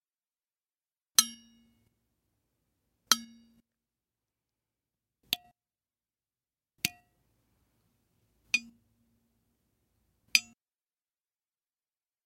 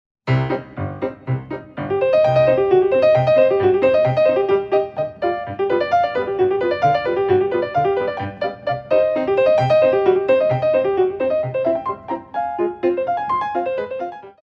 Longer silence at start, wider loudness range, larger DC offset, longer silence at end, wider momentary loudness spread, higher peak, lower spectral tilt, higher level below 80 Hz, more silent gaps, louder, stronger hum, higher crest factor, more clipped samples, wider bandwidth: first, 1.2 s vs 0.25 s; first, 8 LU vs 4 LU; neither; first, 1.85 s vs 0.1 s; about the same, 10 LU vs 11 LU; about the same, -2 dBFS vs -4 dBFS; second, 1.5 dB/octave vs -8.5 dB/octave; second, -80 dBFS vs -52 dBFS; neither; second, -29 LUFS vs -18 LUFS; neither; first, 38 dB vs 14 dB; neither; first, 16.5 kHz vs 6.2 kHz